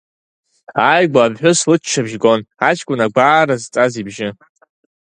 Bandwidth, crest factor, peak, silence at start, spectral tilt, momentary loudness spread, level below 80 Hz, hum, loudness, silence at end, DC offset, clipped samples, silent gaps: 10.5 kHz; 16 dB; 0 dBFS; 0.7 s; -4 dB/octave; 12 LU; -58 dBFS; none; -14 LUFS; 0.8 s; under 0.1%; under 0.1%; none